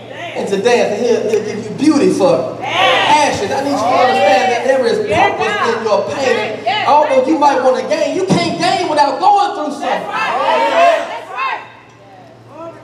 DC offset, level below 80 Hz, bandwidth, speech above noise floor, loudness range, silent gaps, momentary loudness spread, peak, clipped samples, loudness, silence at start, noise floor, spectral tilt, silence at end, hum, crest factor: under 0.1%; -58 dBFS; 13.5 kHz; 26 dB; 2 LU; none; 8 LU; 0 dBFS; under 0.1%; -13 LUFS; 0 s; -39 dBFS; -4 dB/octave; 0 s; none; 12 dB